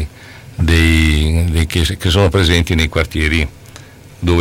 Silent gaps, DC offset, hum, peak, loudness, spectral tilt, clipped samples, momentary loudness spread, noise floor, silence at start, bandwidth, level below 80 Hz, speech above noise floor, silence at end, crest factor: none; under 0.1%; none; -2 dBFS; -14 LUFS; -5.5 dB/octave; under 0.1%; 9 LU; -37 dBFS; 0 s; 16 kHz; -20 dBFS; 23 dB; 0 s; 12 dB